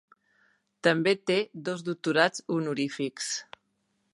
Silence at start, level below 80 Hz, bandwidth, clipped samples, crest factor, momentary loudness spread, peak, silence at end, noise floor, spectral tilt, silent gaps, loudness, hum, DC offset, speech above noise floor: 0.85 s; -80 dBFS; 11.5 kHz; under 0.1%; 22 dB; 9 LU; -6 dBFS; 0.7 s; -75 dBFS; -4 dB/octave; none; -28 LUFS; none; under 0.1%; 47 dB